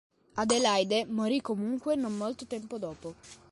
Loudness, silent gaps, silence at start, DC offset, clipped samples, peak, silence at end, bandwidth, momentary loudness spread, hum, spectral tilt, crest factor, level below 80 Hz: -30 LUFS; none; 0.35 s; under 0.1%; under 0.1%; -12 dBFS; 0.15 s; 11.5 kHz; 15 LU; none; -3.5 dB/octave; 18 dB; -68 dBFS